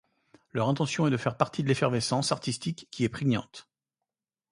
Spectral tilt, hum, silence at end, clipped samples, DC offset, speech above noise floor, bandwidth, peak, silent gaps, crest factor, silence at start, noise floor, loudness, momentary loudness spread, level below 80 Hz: -5.5 dB/octave; none; 0.9 s; under 0.1%; under 0.1%; 61 dB; 11.5 kHz; -6 dBFS; none; 22 dB; 0.55 s; -89 dBFS; -29 LUFS; 9 LU; -62 dBFS